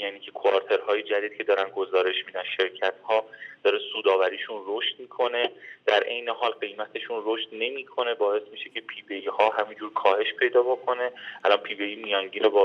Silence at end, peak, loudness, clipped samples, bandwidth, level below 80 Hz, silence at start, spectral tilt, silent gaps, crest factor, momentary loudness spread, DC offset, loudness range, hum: 0 s; -6 dBFS; -26 LUFS; under 0.1%; 6.4 kHz; under -90 dBFS; 0 s; -3.5 dB/octave; none; 20 dB; 9 LU; under 0.1%; 3 LU; none